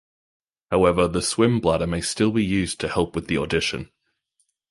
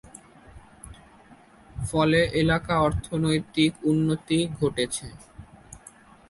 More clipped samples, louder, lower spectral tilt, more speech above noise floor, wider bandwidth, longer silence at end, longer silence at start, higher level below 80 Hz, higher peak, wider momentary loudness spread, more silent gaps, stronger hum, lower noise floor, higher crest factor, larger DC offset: neither; about the same, -22 LUFS vs -24 LUFS; about the same, -5 dB/octave vs -5.5 dB/octave; first, 50 dB vs 29 dB; about the same, 11.5 kHz vs 11.5 kHz; first, 0.85 s vs 0.5 s; first, 0.7 s vs 0.15 s; about the same, -42 dBFS vs -46 dBFS; first, -4 dBFS vs -8 dBFS; second, 6 LU vs 24 LU; neither; neither; first, -71 dBFS vs -52 dBFS; about the same, 20 dB vs 18 dB; neither